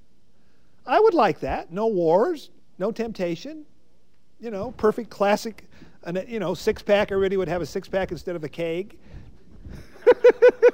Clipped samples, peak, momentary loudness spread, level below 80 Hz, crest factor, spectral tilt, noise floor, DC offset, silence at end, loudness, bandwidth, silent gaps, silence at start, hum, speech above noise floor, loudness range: under 0.1%; -4 dBFS; 21 LU; -50 dBFS; 18 dB; -6 dB/octave; -65 dBFS; 0.6%; 0 s; -23 LUFS; 16 kHz; none; 0.85 s; none; 42 dB; 5 LU